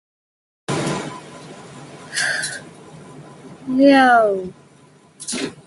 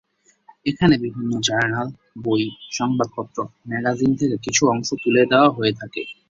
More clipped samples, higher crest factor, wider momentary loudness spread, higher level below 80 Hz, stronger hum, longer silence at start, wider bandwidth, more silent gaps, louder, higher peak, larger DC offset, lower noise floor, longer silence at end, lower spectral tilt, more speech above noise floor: neither; about the same, 20 dB vs 18 dB; first, 26 LU vs 13 LU; second, -60 dBFS vs -54 dBFS; neither; about the same, 0.7 s vs 0.65 s; first, 11.5 kHz vs 7.8 kHz; neither; about the same, -18 LUFS vs -20 LUFS; about the same, -2 dBFS vs -2 dBFS; neither; about the same, -50 dBFS vs -53 dBFS; about the same, 0.15 s vs 0.15 s; about the same, -4 dB/octave vs -4.5 dB/octave; about the same, 35 dB vs 33 dB